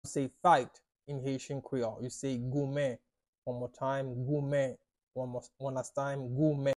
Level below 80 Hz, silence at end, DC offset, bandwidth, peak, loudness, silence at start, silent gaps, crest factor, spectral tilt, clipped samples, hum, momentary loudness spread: -66 dBFS; 0.05 s; under 0.1%; 12 kHz; -12 dBFS; -34 LUFS; 0.05 s; 3.28-3.42 s, 5.03-5.07 s; 22 dB; -6.5 dB/octave; under 0.1%; none; 13 LU